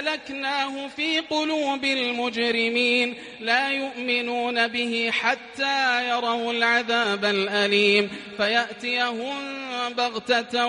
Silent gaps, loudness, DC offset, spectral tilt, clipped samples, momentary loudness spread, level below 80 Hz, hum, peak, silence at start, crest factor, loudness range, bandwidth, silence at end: none; -23 LUFS; under 0.1%; -3 dB/octave; under 0.1%; 7 LU; -70 dBFS; none; -6 dBFS; 0 s; 18 dB; 2 LU; 11.5 kHz; 0 s